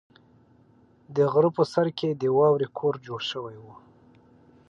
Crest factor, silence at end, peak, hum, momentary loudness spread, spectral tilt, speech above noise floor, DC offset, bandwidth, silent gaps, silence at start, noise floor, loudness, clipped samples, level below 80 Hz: 18 dB; 1 s; -8 dBFS; none; 11 LU; -7 dB/octave; 34 dB; under 0.1%; 9 kHz; none; 1.1 s; -58 dBFS; -25 LUFS; under 0.1%; -70 dBFS